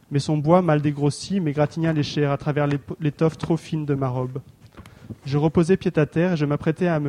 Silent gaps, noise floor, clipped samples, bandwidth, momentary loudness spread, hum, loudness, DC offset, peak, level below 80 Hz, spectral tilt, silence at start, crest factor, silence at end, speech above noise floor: none; -45 dBFS; under 0.1%; 10.5 kHz; 8 LU; none; -22 LUFS; under 0.1%; -4 dBFS; -52 dBFS; -7.5 dB/octave; 0.1 s; 18 dB; 0 s; 24 dB